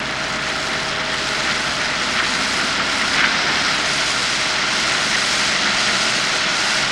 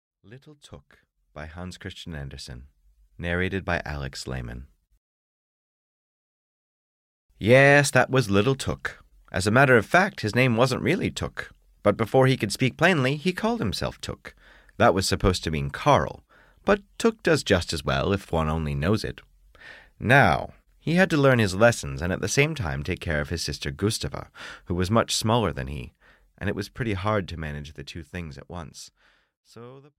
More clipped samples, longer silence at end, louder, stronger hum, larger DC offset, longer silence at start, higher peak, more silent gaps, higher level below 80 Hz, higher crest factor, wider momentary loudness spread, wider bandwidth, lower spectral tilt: neither; second, 0 s vs 0.2 s; first, -17 LUFS vs -23 LUFS; neither; neither; second, 0 s vs 0.3 s; first, -2 dBFS vs -6 dBFS; second, none vs 4.97-7.29 s, 29.37-29.43 s; about the same, -46 dBFS vs -44 dBFS; about the same, 18 dB vs 20 dB; second, 5 LU vs 19 LU; about the same, 16 kHz vs 15.5 kHz; second, -1 dB/octave vs -5 dB/octave